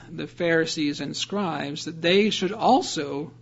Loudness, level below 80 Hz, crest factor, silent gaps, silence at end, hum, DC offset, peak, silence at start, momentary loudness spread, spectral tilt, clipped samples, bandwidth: -24 LUFS; -62 dBFS; 18 dB; none; 0.1 s; none; under 0.1%; -8 dBFS; 0 s; 10 LU; -4 dB/octave; under 0.1%; 8 kHz